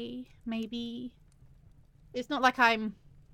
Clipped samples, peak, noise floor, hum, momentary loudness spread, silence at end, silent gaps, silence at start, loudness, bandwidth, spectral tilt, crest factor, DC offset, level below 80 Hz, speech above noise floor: under 0.1%; -10 dBFS; -58 dBFS; none; 18 LU; 0.4 s; none; 0 s; -30 LUFS; 15.5 kHz; -4 dB/octave; 24 dB; under 0.1%; -62 dBFS; 27 dB